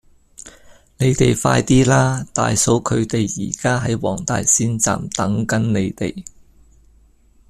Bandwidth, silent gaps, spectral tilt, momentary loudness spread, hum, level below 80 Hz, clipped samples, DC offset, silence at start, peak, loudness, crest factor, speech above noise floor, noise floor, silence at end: 13.5 kHz; none; -4.5 dB/octave; 7 LU; none; -40 dBFS; under 0.1%; under 0.1%; 0.45 s; -2 dBFS; -18 LUFS; 18 dB; 35 dB; -52 dBFS; 1.2 s